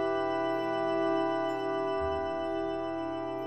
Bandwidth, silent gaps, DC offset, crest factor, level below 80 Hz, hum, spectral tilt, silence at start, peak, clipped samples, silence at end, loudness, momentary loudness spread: 8.4 kHz; none; 0.2%; 12 dB; -56 dBFS; none; -6.5 dB/octave; 0 s; -18 dBFS; under 0.1%; 0 s; -31 LUFS; 5 LU